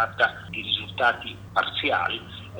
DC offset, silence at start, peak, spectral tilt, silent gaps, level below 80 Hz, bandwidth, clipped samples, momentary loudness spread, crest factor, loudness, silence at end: under 0.1%; 0 s; -6 dBFS; -4.5 dB/octave; none; -54 dBFS; over 20 kHz; under 0.1%; 9 LU; 20 dB; -25 LUFS; 0 s